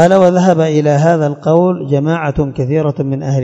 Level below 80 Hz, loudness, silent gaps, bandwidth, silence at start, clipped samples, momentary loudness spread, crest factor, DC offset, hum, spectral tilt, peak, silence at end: -40 dBFS; -12 LUFS; none; 8.6 kHz; 0 s; 0.4%; 7 LU; 12 dB; under 0.1%; none; -7.5 dB/octave; 0 dBFS; 0 s